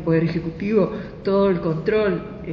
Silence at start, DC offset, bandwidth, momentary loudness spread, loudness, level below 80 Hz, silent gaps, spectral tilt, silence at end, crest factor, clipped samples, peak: 0 s; under 0.1%; 6.4 kHz; 7 LU; -21 LUFS; -44 dBFS; none; -9.5 dB/octave; 0 s; 16 dB; under 0.1%; -6 dBFS